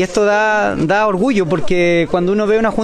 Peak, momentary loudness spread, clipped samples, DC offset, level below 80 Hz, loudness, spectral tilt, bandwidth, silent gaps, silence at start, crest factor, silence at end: -2 dBFS; 2 LU; under 0.1%; under 0.1%; -38 dBFS; -14 LUFS; -6 dB/octave; 11 kHz; none; 0 s; 12 dB; 0 s